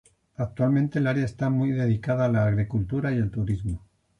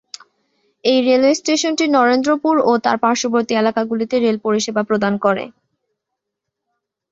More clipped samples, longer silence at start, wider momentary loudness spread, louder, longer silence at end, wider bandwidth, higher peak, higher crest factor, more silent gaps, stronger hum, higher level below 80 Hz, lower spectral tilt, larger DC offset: neither; second, 0.4 s vs 0.85 s; first, 10 LU vs 6 LU; second, -25 LUFS vs -16 LUFS; second, 0.4 s vs 1.6 s; first, 9.6 kHz vs 8 kHz; second, -12 dBFS vs -2 dBFS; about the same, 14 dB vs 16 dB; neither; neither; first, -46 dBFS vs -62 dBFS; first, -9 dB/octave vs -4 dB/octave; neither